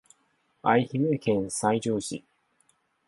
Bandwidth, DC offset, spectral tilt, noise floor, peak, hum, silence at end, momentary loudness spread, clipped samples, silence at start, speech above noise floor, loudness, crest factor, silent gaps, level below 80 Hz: 11.5 kHz; under 0.1%; -5.5 dB/octave; -70 dBFS; -8 dBFS; none; 0.9 s; 8 LU; under 0.1%; 0.65 s; 45 dB; -27 LUFS; 20 dB; none; -64 dBFS